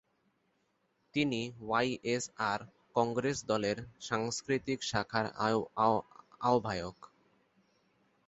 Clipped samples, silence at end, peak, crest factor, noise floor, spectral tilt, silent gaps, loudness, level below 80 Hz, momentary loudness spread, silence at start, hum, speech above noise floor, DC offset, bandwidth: under 0.1%; 1.2 s; -14 dBFS; 22 dB; -77 dBFS; -4 dB/octave; none; -34 LUFS; -66 dBFS; 7 LU; 1.15 s; none; 44 dB; under 0.1%; 8 kHz